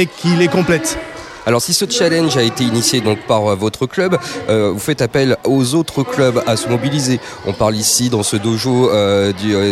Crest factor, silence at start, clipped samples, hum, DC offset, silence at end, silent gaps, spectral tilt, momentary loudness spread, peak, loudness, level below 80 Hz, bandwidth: 14 dB; 0 s; under 0.1%; none; under 0.1%; 0 s; none; -4.5 dB/octave; 5 LU; -2 dBFS; -15 LUFS; -46 dBFS; 16 kHz